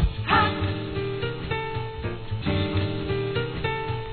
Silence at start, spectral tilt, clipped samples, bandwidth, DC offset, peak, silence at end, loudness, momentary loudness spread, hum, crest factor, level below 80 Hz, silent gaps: 0 s; -9.5 dB/octave; under 0.1%; 4.6 kHz; 0.3%; -6 dBFS; 0 s; -27 LUFS; 10 LU; none; 22 dB; -36 dBFS; none